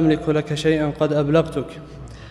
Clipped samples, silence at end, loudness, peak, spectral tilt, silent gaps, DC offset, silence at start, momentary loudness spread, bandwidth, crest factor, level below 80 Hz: under 0.1%; 0 s; -20 LUFS; -4 dBFS; -7 dB/octave; none; under 0.1%; 0 s; 19 LU; 11.5 kHz; 16 dB; -44 dBFS